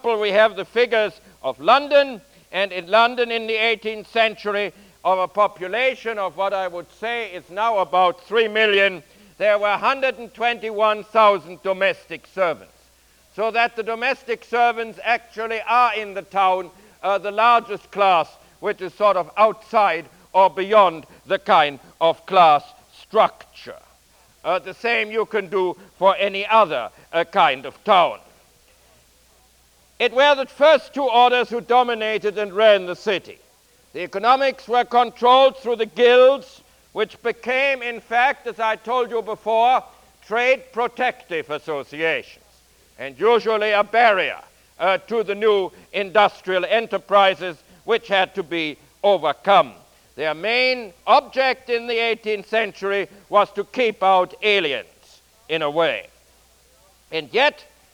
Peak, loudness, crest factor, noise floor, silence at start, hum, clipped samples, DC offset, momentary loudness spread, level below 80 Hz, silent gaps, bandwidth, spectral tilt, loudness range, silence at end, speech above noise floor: -2 dBFS; -19 LUFS; 18 dB; -56 dBFS; 0.05 s; none; under 0.1%; under 0.1%; 11 LU; -62 dBFS; none; 19 kHz; -4 dB/octave; 5 LU; 0.4 s; 37 dB